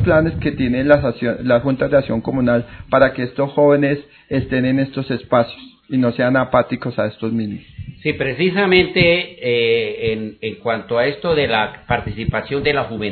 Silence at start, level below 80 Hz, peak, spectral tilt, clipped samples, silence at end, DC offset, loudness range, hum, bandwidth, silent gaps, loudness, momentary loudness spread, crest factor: 0 s; -40 dBFS; 0 dBFS; -9.5 dB/octave; under 0.1%; 0 s; under 0.1%; 3 LU; none; 4.6 kHz; none; -18 LUFS; 10 LU; 18 dB